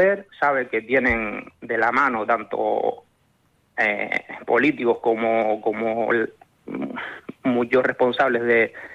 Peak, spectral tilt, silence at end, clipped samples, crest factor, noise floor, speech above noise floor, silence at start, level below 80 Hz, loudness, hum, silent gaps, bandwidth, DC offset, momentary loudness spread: -8 dBFS; -6.5 dB/octave; 0 s; under 0.1%; 14 dB; -63 dBFS; 42 dB; 0 s; -52 dBFS; -22 LUFS; none; none; 8 kHz; under 0.1%; 11 LU